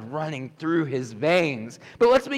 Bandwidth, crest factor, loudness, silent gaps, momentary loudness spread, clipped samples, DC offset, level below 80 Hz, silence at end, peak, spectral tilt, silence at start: 12.5 kHz; 12 dB; -24 LUFS; none; 13 LU; under 0.1%; under 0.1%; -58 dBFS; 0 s; -10 dBFS; -6 dB/octave; 0 s